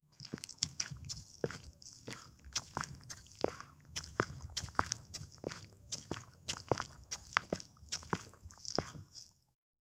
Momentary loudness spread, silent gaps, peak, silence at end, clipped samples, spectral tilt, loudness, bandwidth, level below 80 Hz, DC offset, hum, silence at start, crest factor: 13 LU; none; -6 dBFS; 0.7 s; under 0.1%; -3 dB/octave; -42 LUFS; 16 kHz; -60 dBFS; under 0.1%; none; 0.2 s; 36 dB